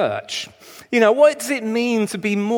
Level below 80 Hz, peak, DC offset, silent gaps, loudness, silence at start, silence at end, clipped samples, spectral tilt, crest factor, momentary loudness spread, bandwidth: -68 dBFS; -2 dBFS; under 0.1%; none; -19 LUFS; 0 s; 0 s; under 0.1%; -4.5 dB/octave; 16 dB; 14 LU; 19 kHz